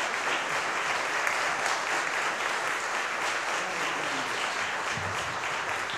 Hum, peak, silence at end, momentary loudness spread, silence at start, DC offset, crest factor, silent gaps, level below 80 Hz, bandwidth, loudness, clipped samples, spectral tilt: none; -10 dBFS; 0 s; 3 LU; 0 s; under 0.1%; 20 dB; none; -68 dBFS; 13.5 kHz; -28 LUFS; under 0.1%; -1 dB/octave